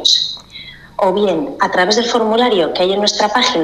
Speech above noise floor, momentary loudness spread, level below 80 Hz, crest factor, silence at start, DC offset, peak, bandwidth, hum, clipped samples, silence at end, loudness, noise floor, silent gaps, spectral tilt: 21 dB; 14 LU; -50 dBFS; 14 dB; 0 s; under 0.1%; 0 dBFS; 13.5 kHz; none; under 0.1%; 0 s; -14 LUFS; -35 dBFS; none; -2.5 dB/octave